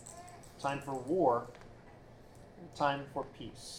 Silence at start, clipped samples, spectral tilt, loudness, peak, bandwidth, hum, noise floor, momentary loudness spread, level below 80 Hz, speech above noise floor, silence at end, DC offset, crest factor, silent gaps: 0 s; under 0.1%; -5.5 dB/octave; -35 LUFS; -16 dBFS; 17.5 kHz; none; -55 dBFS; 25 LU; -62 dBFS; 20 dB; 0 s; under 0.1%; 22 dB; none